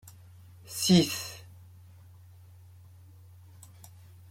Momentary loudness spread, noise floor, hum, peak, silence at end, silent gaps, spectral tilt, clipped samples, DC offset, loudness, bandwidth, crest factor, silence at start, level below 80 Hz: 30 LU; -53 dBFS; none; -10 dBFS; 2.9 s; none; -4.5 dB/octave; under 0.1%; under 0.1%; -27 LUFS; 16.5 kHz; 24 dB; 0.05 s; -68 dBFS